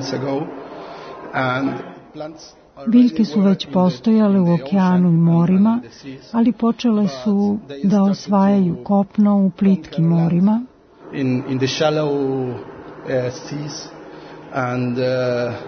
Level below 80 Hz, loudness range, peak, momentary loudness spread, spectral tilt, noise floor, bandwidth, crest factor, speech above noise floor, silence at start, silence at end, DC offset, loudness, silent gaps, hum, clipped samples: -56 dBFS; 7 LU; -4 dBFS; 19 LU; -7.5 dB/octave; -37 dBFS; 6.6 kHz; 14 dB; 20 dB; 0 s; 0 s; under 0.1%; -18 LUFS; none; none; under 0.1%